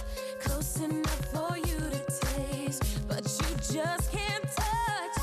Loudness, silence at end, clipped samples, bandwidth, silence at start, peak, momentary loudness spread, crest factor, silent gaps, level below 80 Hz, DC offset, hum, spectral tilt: -32 LUFS; 0 s; under 0.1%; 15 kHz; 0 s; -20 dBFS; 3 LU; 12 dB; none; -38 dBFS; under 0.1%; none; -4.5 dB/octave